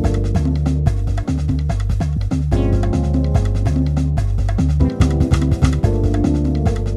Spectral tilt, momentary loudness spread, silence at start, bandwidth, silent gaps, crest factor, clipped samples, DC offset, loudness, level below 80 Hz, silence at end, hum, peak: -8 dB/octave; 4 LU; 0 s; 10.5 kHz; none; 14 dB; under 0.1%; under 0.1%; -18 LUFS; -20 dBFS; 0 s; none; -2 dBFS